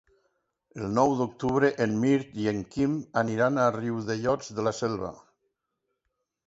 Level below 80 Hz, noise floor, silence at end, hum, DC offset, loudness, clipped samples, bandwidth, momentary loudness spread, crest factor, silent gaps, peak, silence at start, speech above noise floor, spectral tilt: -60 dBFS; -81 dBFS; 1.3 s; none; under 0.1%; -27 LUFS; under 0.1%; 8 kHz; 7 LU; 20 dB; none; -8 dBFS; 0.75 s; 55 dB; -6.5 dB/octave